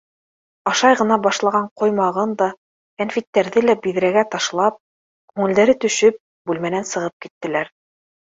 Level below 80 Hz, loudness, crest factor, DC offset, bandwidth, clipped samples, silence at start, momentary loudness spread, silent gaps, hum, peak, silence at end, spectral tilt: -64 dBFS; -19 LUFS; 18 dB; under 0.1%; 7.8 kHz; under 0.1%; 0.65 s; 11 LU; 1.71-1.76 s, 2.57-2.97 s, 3.27-3.33 s, 4.80-5.28 s, 6.20-6.45 s, 7.13-7.20 s, 7.31-7.41 s; none; -2 dBFS; 0.65 s; -4 dB/octave